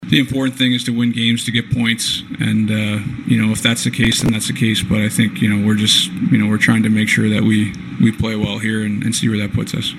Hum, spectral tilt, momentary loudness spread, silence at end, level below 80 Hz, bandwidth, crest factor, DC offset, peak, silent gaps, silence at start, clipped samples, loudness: none; -4.5 dB/octave; 6 LU; 0 s; -42 dBFS; 14.5 kHz; 16 dB; under 0.1%; 0 dBFS; none; 0 s; under 0.1%; -16 LUFS